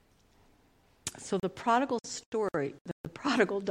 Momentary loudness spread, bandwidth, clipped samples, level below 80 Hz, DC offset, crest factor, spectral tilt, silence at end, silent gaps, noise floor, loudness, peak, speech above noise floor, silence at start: 13 LU; 16 kHz; under 0.1%; -66 dBFS; under 0.1%; 22 dB; -4.5 dB/octave; 0 s; 2.26-2.32 s, 2.81-2.85 s, 2.92-3.04 s; -65 dBFS; -32 LUFS; -12 dBFS; 34 dB; 1.05 s